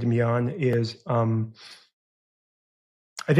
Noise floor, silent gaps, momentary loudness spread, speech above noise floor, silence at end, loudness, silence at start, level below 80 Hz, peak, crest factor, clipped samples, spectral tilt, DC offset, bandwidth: under -90 dBFS; 1.93-3.16 s; 19 LU; over 65 dB; 0 s; -26 LUFS; 0 s; -64 dBFS; -6 dBFS; 20 dB; under 0.1%; -7.5 dB/octave; under 0.1%; 10.5 kHz